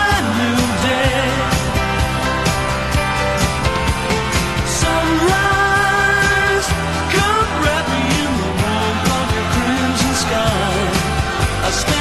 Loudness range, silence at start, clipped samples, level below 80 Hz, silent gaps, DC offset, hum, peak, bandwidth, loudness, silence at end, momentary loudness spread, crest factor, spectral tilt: 2 LU; 0 s; under 0.1%; -26 dBFS; none; 0.5%; none; -2 dBFS; 13.5 kHz; -16 LUFS; 0 s; 4 LU; 14 dB; -4 dB/octave